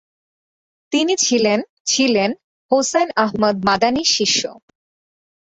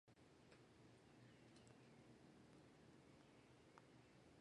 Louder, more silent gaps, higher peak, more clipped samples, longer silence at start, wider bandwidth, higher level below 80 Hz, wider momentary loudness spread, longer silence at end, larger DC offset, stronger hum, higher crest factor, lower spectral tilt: first, -17 LUFS vs -69 LUFS; first, 1.70-1.85 s, 2.44-2.69 s vs none; first, -2 dBFS vs -46 dBFS; neither; first, 0.9 s vs 0.05 s; second, 8.4 kHz vs 11 kHz; first, -56 dBFS vs -86 dBFS; first, 6 LU vs 2 LU; first, 0.9 s vs 0 s; neither; neither; about the same, 18 dB vs 22 dB; second, -2.5 dB/octave vs -5.5 dB/octave